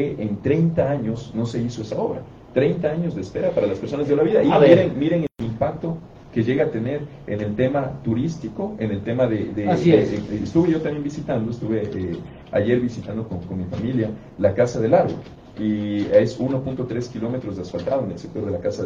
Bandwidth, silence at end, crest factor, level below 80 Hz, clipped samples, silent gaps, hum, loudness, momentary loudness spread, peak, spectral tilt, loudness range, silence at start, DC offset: 7.6 kHz; 0 s; 22 dB; -48 dBFS; under 0.1%; none; none; -22 LUFS; 12 LU; 0 dBFS; -8 dB/octave; 5 LU; 0 s; under 0.1%